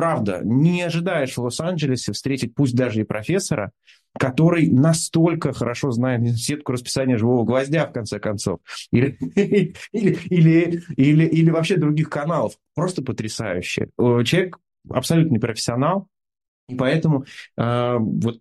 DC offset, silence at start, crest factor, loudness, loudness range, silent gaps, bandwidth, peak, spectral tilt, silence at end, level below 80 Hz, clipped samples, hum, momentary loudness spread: under 0.1%; 0 s; 16 dB; -20 LUFS; 4 LU; 16.48-16.67 s; 12.5 kHz; -4 dBFS; -6 dB/octave; 0.05 s; -54 dBFS; under 0.1%; none; 9 LU